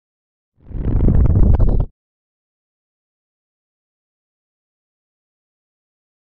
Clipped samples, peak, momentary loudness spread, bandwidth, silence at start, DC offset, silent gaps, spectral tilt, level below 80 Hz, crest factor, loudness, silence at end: under 0.1%; -2 dBFS; 13 LU; 2.4 kHz; 0.7 s; under 0.1%; none; -12.5 dB/octave; -22 dBFS; 18 dB; -17 LUFS; 4.4 s